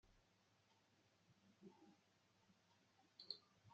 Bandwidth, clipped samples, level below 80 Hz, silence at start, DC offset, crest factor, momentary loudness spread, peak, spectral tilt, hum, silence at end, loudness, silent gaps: 7.6 kHz; under 0.1%; -90 dBFS; 0.05 s; under 0.1%; 34 dB; 13 LU; -34 dBFS; -2 dB/octave; none; 0 s; -60 LUFS; none